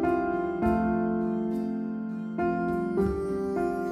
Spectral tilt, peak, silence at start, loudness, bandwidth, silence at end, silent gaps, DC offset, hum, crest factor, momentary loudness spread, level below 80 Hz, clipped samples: -9 dB/octave; -14 dBFS; 0 s; -28 LUFS; 12 kHz; 0 s; none; under 0.1%; none; 14 dB; 6 LU; -46 dBFS; under 0.1%